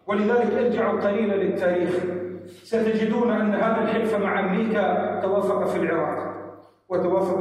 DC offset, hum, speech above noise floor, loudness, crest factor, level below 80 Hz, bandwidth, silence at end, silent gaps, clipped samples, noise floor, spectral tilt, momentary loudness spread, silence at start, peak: under 0.1%; none; 20 dB; -23 LUFS; 12 dB; -68 dBFS; 12.5 kHz; 0 s; none; under 0.1%; -42 dBFS; -7.5 dB/octave; 8 LU; 0.05 s; -10 dBFS